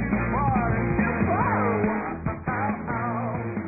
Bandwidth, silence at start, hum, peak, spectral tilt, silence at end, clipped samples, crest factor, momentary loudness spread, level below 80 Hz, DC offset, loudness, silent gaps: 2.7 kHz; 0 s; none; -10 dBFS; -15.5 dB/octave; 0 s; under 0.1%; 14 dB; 6 LU; -38 dBFS; under 0.1%; -25 LUFS; none